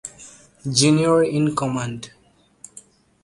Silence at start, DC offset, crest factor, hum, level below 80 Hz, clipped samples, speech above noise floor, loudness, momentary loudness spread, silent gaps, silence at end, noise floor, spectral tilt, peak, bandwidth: 0.05 s; under 0.1%; 20 dB; none; -56 dBFS; under 0.1%; 30 dB; -19 LUFS; 25 LU; none; 0.45 s; -49 dBFS; -4.5 dB/octave; -2 dBFS; 11.5 kHz